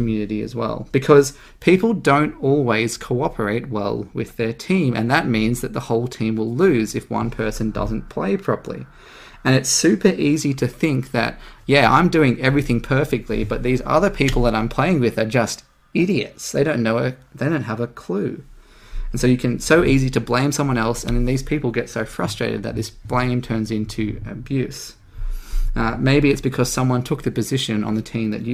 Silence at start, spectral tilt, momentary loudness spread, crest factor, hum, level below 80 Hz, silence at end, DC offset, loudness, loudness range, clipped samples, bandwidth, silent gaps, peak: 0 s; -5.5 dB/octave; 10 LU; 20 dB; none; -32 dBFS; 0 s; under 0.1%; -20 LUFS; 5 LU; under 0.1%; 16 kHz; none; 0 dBFS